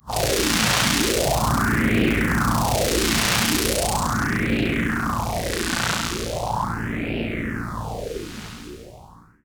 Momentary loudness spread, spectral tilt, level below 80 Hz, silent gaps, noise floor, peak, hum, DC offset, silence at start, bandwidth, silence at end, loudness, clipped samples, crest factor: 12 LU; -3.5 dB/octave; -34 dBFS; none; -47 dBFS; -2 dBFS; none; under 0.1%; 0.05 s; over 20 kHz; 0.3 s; -22 LUFS; under 0.1%; 20 dB